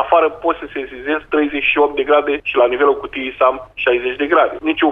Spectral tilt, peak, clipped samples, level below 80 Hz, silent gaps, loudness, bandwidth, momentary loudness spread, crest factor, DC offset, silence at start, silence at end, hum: -6.5 dB/octave; 0 dBFS; under 0.1%; -48 dBFS; none; -16 LUFS; 4 kHz; 8 LU; 16 dB; under 0.1%; 0 s; 0 s; none